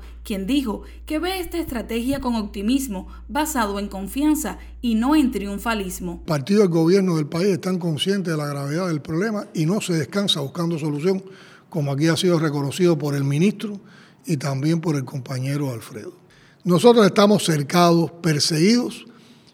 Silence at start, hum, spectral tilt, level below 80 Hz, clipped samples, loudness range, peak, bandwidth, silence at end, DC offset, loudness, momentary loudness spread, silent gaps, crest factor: 0 s; none; -5.5 dB/octave; -44 dBFS; under 0.1%; 6 LU; 0 dBFS; 19 kHz; 0.45 s; under 0.1%; -21 LUFS; 13 LU; none; 20 dB